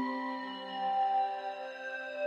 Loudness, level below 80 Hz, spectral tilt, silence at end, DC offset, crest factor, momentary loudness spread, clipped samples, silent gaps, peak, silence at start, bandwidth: -35 LUFS; under -90 dBFS; -4.5 dB/octave; 0 s; under 0.1%; 12 dB; 10 LU; under 0.1%; none; -24 dBFS; 0 s; 7.4 kHz